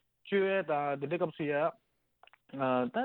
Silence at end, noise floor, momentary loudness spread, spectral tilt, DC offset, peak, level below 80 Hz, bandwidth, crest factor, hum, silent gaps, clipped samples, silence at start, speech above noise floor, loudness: 0 s; -65 dBFS; 5 LU; -9 dB/octave; under 0.1%; -18 dBFS; -80 dBFS; 4.2 kHz; 16 dB; none; none; under 0.1%; 0.25 s; 33 dB; -33 LUFS